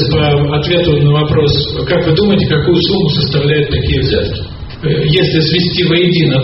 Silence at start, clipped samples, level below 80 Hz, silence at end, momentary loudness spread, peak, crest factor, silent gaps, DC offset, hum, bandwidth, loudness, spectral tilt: 0 s; under 0.1%; -28 dBFS; 0 s; 4 LU; 0 dBFS; 12 dB; none; under 0.1%; none; 6 kHz; -11 LUFS; -5 dB/octave